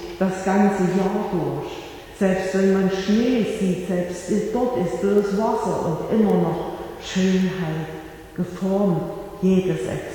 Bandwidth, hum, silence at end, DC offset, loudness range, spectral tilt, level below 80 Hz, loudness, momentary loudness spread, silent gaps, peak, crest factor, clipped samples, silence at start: 18 kHz; none; 0 s; under 0.1%; 2 LU; -7 dB/octave; -48 dBFS; -22 LUFS; 11 LU; none; -6 dBFS; 16 dB; under 0.1%; 0 s